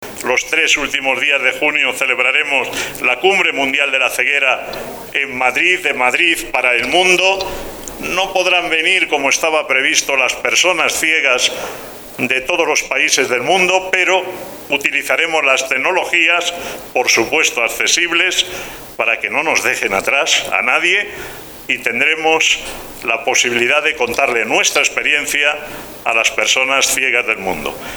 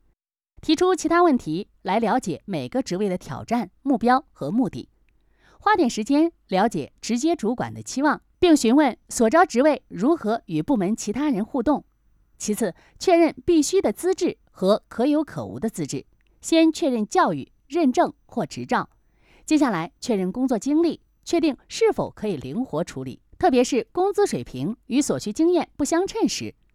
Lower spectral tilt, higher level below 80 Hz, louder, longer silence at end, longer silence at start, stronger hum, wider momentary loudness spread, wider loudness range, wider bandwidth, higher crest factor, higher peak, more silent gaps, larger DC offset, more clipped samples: second, -0.5 dB/octave vs -5 dB/octave; first, -46 dBFS vs -54 dBFS; first, -13 LUFS vs -23 LUFS; second, 0 s vs 0.25 s; second, 0 s vs 0.65 s; neither; about the same, 9 LU vs 11 LU; second, 1 LU vs 4 LU; first, over 20 kHz vs 14.5 kHz; about the same, 16 dB vs 18 dB; first, 0 dBFS vs -6 dBFS; neither; neither; neither